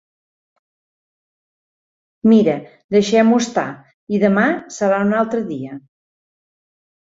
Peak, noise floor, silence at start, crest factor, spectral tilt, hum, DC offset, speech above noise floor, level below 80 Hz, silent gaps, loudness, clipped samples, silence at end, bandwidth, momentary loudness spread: -2 dBFS; under -90 dBFS; 2.25 s; 16 dB; -6 dB/octave; none; under 0.1%; over 74 dB; -62 dBFS; 2.84-2.89 s, 3.94-4.07 s; -17 LUFS; under 0.1%; 1.25 s; 7.8 kHz; 14 LU